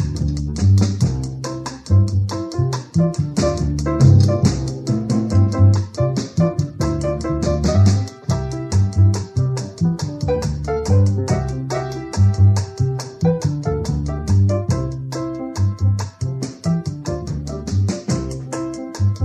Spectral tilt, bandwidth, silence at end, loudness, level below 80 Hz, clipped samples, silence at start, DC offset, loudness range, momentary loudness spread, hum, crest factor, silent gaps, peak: -7 dB/octave; 10 kHz; 0 s; -19 LUFS; -32 dBFS; under 0.1%; 0 s; under 0.1%; 6 LU; 10 LU; none; 18 dB; none; 0 dBFS